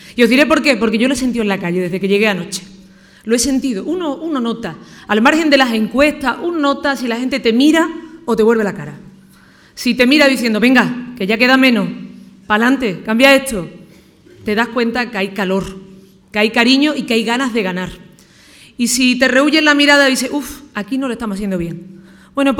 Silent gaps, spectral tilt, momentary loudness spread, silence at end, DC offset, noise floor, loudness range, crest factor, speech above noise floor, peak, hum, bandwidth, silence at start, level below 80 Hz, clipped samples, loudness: none; -4 dB/octave; 15 LU; 0 s; under 0.1%; -45 dBFS; 4 LU; 16 dB; 31 dB; 0 dBFS; none; 17.5 kHz; 0.05 s; -46 dBFS; under 0.1%; -14 LUFS